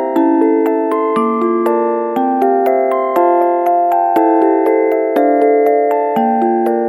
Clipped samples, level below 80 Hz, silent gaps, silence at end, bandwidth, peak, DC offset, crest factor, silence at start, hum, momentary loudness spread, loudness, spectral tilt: under 0.1%; -68 dBFS; none; 0 s; 17.5 kHz; 0 dBFS; under 0.1%; 12 dB; 0 s; none; 3 LU; -13 LUFS; -7 dB/octave